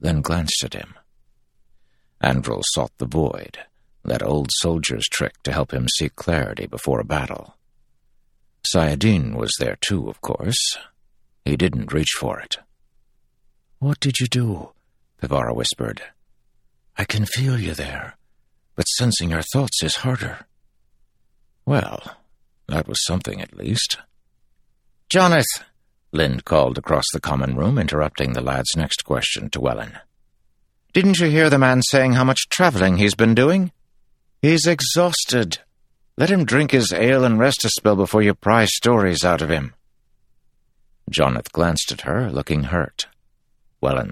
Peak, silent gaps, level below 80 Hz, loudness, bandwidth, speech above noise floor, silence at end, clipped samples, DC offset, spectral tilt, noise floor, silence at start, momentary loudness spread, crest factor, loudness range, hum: 0 dBFS; none; -40 dBFS; -20 LUFS; 16 kHz; 42 dB; 0 s; under 0.1%; under 0.1%; -4.5 dB/octave; -61 dBFS; 0 s; 13 LU; 20 dB; 8 LU; none